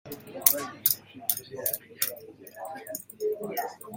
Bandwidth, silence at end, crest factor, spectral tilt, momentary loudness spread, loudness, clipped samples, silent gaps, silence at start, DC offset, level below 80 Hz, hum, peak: 17 kHz; 0 s; 32 dB; -1.5 dB/octave; 18 LU; -28 LUFS; under 0.1%; none; 0.05 s; under 0.1%; -72 dBFS; none; 0 dBFS